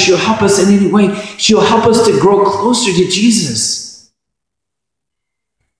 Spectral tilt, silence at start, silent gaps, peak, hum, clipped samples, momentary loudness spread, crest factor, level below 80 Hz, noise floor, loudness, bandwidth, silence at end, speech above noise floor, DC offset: -4 dB/octave; 0 s; none; 0 dBFS; none; under 0.1%; 6 LU; 12 dB; -46 dBFS; -80 dBFS; -11 LUFS; 11 kHz; 1.85 s; 69 dB; under 0.1%